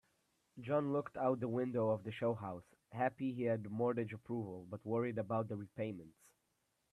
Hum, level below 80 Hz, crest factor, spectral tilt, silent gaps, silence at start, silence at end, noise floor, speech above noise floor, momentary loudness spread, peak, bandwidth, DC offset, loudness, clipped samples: none; -78 dBFS; 18 dB; -9 dB/octave; none; 0.55 s; 0.85 s; -82 dBFS; 43 dB; 11 LU; -22 dBFS; 12.5 kHz; under 0.1%; -40 LUFS; under 0.1%